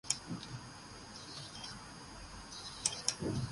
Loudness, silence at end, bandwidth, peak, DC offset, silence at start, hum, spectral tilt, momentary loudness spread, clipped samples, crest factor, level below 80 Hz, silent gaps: -41 LUFS; 0 s; 11.5 kHz; -12 dBFS; under 0.1%; 0.05 s; none; -2.5 dB/octave; 14 LU; under 0.1%; 30 dB; -60 dBFS; none